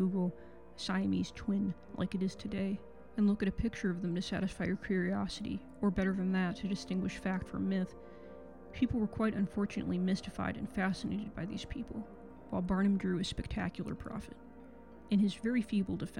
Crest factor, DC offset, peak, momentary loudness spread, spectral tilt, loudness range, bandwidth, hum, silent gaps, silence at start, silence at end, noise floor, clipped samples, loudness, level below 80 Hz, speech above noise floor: 16 dB; 0.1%; -18 dBFS; 15 LU; -6.5 dB/octave; 2 LU; 11 kHz; none; none; 0 s; 0 s; -54 dBFS; under 0.1%; -36 LUFS; -54 dBFS; 19 dB